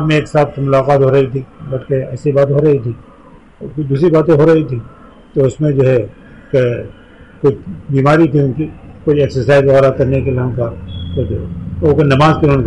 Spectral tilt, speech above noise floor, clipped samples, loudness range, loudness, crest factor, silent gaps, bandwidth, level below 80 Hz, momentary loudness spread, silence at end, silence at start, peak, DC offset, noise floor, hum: -8.5 dB/octave; 28 dB; under 0.1%; 3 LU; -13 LUFS; 12 dB; none; 9 kHz; -36 dBFS; 14 LU; 0 s; 0 s; -2 dBFS; 0.2%; -40 dBFS; none